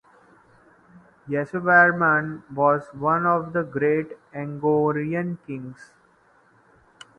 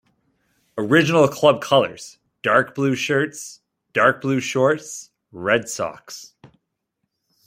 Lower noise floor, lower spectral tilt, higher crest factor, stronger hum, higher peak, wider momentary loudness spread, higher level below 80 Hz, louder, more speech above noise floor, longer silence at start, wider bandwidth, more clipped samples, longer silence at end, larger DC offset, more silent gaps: second, -59 dBFS vs -77 dBFS; first, -8.5 dB/octave vs -4.5 dB/octave; about the same, 22 dB vs 20 dB; neither; about the same, -2 dBFS vs -2 dBFS; about the same, 18 LU vs 20 LU; about the same, -64 dBFS vs -64 dBFS; second, -22 LUFS vs -19 LUFS; second, 37 dB vs 57 dB; first, 0.95 s vs 0.75 s; second, 9 kHz vs 16 kHz; neither; first, 1.35 s vs 1.2 s; neither; neither